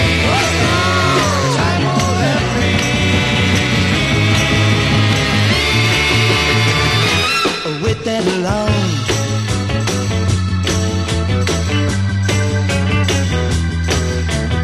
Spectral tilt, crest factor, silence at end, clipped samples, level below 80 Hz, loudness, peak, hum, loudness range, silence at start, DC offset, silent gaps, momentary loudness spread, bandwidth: -4.5 dB/octave; 14 dB; 0 s; under 0.1%; -26 dBFS; -14 LUFS; -2 dBFS; none; 4 LU; 0 s; under 0.1%; none; 5 LU; 13 kHz